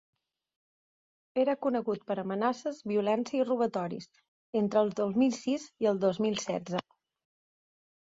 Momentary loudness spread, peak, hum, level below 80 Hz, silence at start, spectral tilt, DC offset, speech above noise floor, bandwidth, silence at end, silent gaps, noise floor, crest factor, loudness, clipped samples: 8 LU; -14 dBFS; none; -74 dBFS; 1.35 s; -5.5 dB/octave; under 0.1%; over 60 dB; 7.8 kHz; 1.2 s; 4.28-4.53 s; under -90 dBFS; 18 dB; -31 LUFS; under 0.1%